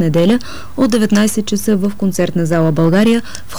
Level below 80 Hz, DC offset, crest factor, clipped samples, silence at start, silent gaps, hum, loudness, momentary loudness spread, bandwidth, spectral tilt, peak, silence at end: -42 dBFS; 6%; 10 dB; under 0.1%; 0 s; none; none; -14 LUFS; 5 LU; over 20 kHz; -6 dB/octave; -4 dBFS; 0 s